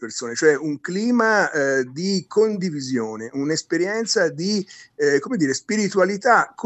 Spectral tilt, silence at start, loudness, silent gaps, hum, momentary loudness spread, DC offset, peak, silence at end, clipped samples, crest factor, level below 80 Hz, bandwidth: -4 dB/octave; 0 s; -21 LUFS; none; none; 8 LU; under 0.1%; -4 dBFS; 0 s; under 0.1%; 18 dB; -72 dBFS; 8.6 kHz